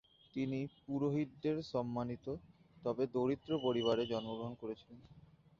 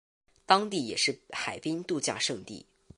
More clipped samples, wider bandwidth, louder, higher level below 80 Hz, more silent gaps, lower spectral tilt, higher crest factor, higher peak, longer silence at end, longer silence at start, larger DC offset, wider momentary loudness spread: neither; second, 7.4 kHz vs 11.5 kHz; second, -39 LUFS vs -29 LUFS; about the same, -68 dBFS vs -68 dBFS; neither; first, -6 dB/octave vs -2.5 dB/octave; second, 18 dB vs 24 dB; second, -22 dBFS vs -6 dBFS; about the same, 0.4 s vs 0.35 s; second, 0.35 s vs 0.5 s; neither; about the same, 13 LU vs 13 LU